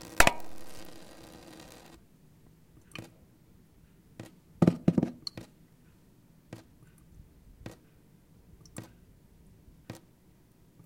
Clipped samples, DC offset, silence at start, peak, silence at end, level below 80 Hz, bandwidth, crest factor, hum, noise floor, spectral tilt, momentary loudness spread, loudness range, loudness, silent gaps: under 0.1%; under 0.1%; 0 s; 0 dBFS; 0.9 s; -52 dBFS; 16.5 kHz; 34 dB; none; -61 dBFS; -4.5 dB/octave; 28 LU; 20 LU; -28 LUFS; none